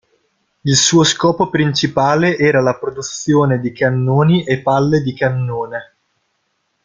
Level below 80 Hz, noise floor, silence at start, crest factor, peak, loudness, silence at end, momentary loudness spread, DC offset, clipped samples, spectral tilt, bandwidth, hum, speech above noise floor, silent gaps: -52 dBFS; -67 dBFS; 0.65 s; 14 dB; 0 dBFS; -15 LUFS; 1 s; 11 LU; under 0.1%; under 0.1%; -4.5 dB/octave; 9.6 kHz; none; 53 dB; none